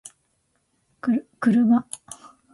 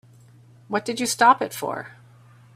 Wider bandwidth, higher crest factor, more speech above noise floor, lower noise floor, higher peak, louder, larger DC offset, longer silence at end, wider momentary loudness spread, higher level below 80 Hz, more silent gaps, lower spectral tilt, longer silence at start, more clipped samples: second, 11.5 kHz vs 16 kHz; about the same, 16 dB vs 20 dB; first, 49 dB vs 29 dB; first, -70 dBFS vs -51 dBFS; second, -8 dBFS vs -4 dBFS; about the same, -22 LUFS vs -22 LUFS; neither; second, 0.4 s vs 0.65 s; first, 22 LU vs 16 LU; about the same, -68 dBFS vs -68 dBFS; neither; first, -6 dB/octave vs -2.5 dB/octave; first, 1.05 s vs 0.7 s; neither